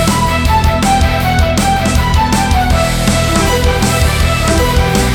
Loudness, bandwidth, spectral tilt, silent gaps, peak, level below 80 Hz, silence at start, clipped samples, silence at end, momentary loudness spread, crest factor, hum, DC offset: -12 LUFS; 18.5 kHz; -4.5 dB/octave; none; 0 dBFS; -16 dBFS; 0 s; under 0.1%; 0 s; 1 LU; 10 dB; none; under 0.1%